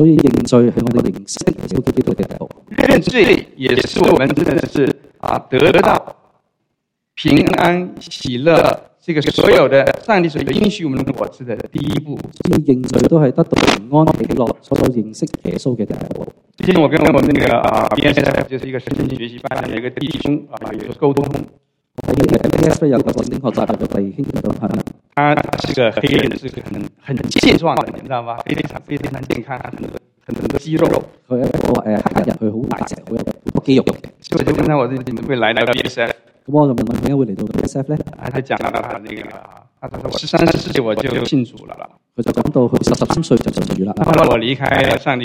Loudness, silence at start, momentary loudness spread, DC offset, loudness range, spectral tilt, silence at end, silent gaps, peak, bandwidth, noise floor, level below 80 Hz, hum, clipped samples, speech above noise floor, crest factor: -16 LUFS; 0 s; 13 LU; under 0.1%; 5 LU; -6 dB/octave; 0 s; none; 0 dBFS; 16.5 kHz; -73 dBFS; -40 dBFS; none; under 0.1%; 58 dB; 16 dB